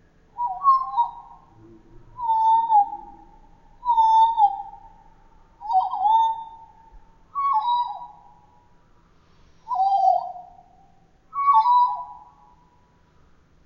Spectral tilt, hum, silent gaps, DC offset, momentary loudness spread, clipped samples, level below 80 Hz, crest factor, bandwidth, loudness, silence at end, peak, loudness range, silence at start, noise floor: -4 dB/octave; none; none; under 0.1%; 20 LU; under 0.1%; -56 dBFS; 16 dB; 6.6 kHz; -21 LUFS; 1.45 s; -8 dBFS; 6 LU; 0.35 s; -58 dBFS